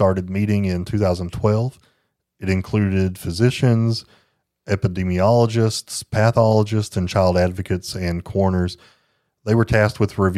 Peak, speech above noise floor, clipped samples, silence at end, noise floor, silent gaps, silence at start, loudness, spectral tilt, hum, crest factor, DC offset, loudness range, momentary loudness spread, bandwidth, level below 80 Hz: -2 dBFS; 50 dB; under 0.1%; 0 s; -69 dBFS; none; 0 s; -20 LUFS; -6.5 dB/octave; none; 18 dB; under 0.1%; 3 LU; 9 LU; 14 kHz; -44 dBFS